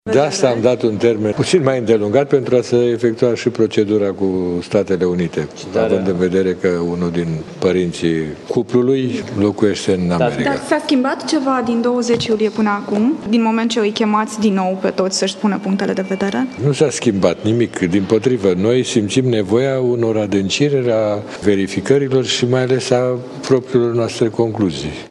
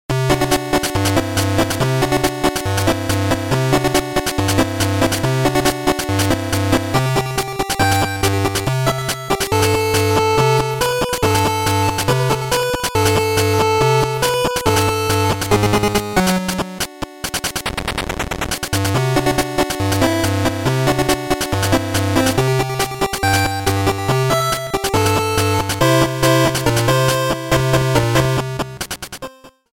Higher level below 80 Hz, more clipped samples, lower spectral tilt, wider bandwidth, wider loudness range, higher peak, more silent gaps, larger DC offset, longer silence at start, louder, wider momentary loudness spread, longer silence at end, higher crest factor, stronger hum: second, -54 dBFS vs -34 dBFS; neither; about the same, -5.5 dB/octave vs -4.5 dB/octave; second, 11.5 kHz vs 17 kHz; about the same, 2 LU vs 3 LU; about the same, 0 dBFS vs 0 dBFS; neither; neither; about the same, 0.05 s vs 0.1 s; about the same, -16 LUFS vs -17 LUFS; about the same, 4 LU vs 6 LU; second, 0.05 s vs 0.3 s; about the same, 16 dB vs 16 dB; neither